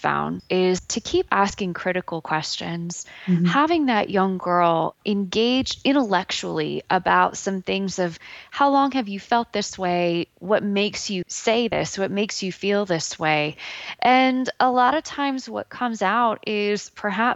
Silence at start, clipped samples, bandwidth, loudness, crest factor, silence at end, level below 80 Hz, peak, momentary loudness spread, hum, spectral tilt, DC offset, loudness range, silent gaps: 0 s; under 0.1%; 8.2 kHz; -22 LUFS; 18 dB; 0 s; -56 dBFS; -4 dBFS; 9 LU; none; -4.5 dB/octave; under 0.1%; 2 LU; none